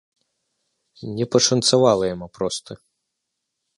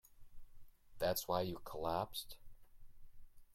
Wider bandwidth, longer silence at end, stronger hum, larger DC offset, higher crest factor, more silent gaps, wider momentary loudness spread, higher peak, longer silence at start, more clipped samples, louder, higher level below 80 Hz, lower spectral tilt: second, 11.5 kHz vs 16.5 kHz; first, 1.05 s vs 0 s; neither; neither; about the same, 20 dB vs 22 dB; neither; about the same, 15 LU vs 13 LU; first, -2 dBFS vs -22 dBFS; first, 1 s vs 0.05 s; neither; first, -19 LUFS vs -41 LUFS; about the same, -56 dBFS vs -60 dBFS; about the same, -4 dB/octave vs -4 dB/octave